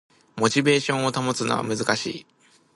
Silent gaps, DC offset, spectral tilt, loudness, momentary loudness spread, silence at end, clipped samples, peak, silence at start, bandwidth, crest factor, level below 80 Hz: none; under 0.1%; -4 dB/octave; -23 LUFS; 12 LU; 0.55 s; under 0.1%; -4 dBFS; 0.35 s; 11.5 kHz; 20 dB; -64 dBFS